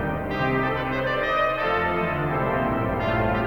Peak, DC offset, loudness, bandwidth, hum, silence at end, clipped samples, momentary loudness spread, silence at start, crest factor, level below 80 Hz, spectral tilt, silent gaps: -10 dBFS; under 0.1%; -24 LUFS; 19 kHz; none; 0 s; under 0.1%; 2 LU; 0 s; 12 dB; -40 dBFS; -7.5 dB/octave; none